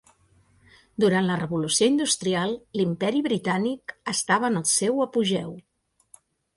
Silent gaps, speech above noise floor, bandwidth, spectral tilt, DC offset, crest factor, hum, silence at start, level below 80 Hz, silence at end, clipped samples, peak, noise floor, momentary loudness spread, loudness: none; 37 dB; 11.5 kHz; -4 dB/octave; under 0.1%; 18 dB; none; 1 s; -64 dBFS; 0.95 s; under 0.1%; -8 dBFS; -61 dBFS; 8 LU; -24 LUFS